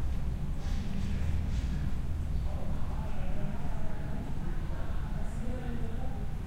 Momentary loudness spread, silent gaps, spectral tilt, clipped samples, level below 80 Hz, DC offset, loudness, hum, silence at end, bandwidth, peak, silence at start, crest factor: 4 LU; none; -7.5 dB/octave; under 0.1%; -34 dBFS; under 0.1%; -37 LUFS; none; 0 s; 8.8 kHz; -18 dBFS; 0 s; 12 dB